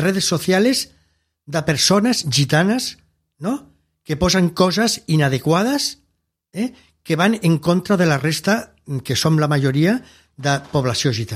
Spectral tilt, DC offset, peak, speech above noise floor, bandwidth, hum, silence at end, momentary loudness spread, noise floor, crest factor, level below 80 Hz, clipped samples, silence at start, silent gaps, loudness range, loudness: -4.5 dB/octave; under 0.1%; -2 dBFS; 51 dB; 15.5 kHz; none; 0 s; 10 LU; -69 dBFS; 18 dB; -46 dBFS; under 0.1%; 0 s; none; 2 LU; -18 LUFS